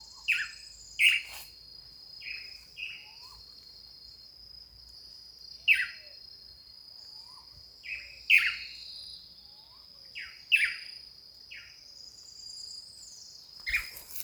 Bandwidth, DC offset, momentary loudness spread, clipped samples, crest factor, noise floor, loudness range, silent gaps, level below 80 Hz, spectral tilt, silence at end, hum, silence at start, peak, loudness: over 20 kHz; under 0.1%; 24 LU; under 0.1%; 26 dB; -53 dBFS; 15 LU; none; -64 dBFS; 1.5 dB/octave; 0 s; none; 0 s; -8 dBFS; -29 LUFS